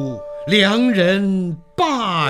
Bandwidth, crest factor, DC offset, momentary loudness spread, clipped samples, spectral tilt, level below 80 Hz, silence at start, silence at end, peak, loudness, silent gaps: 12.5 kHz; 16 dB; under 0.1%; 12 LU; under 0.1%; -5.5 dB/octave; -52 dBFS; 0 s; 0 s; 0 dBFS; -17 LUFS; none